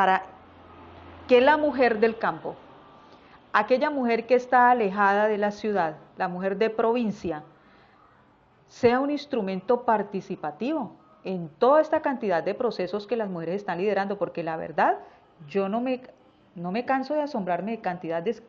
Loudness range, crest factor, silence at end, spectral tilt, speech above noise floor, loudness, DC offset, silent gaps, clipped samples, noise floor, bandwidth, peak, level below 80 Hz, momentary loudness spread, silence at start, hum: 5 LU; 18 dB; 0.1 s; -4 dB/octave; 34 dB; -25 LUFS; under 0.1%; none; under 0.1%; -59 dBFS; 7.2 kHz; -8 dBFS; -66 dBFS; 13 LU; 0 s; none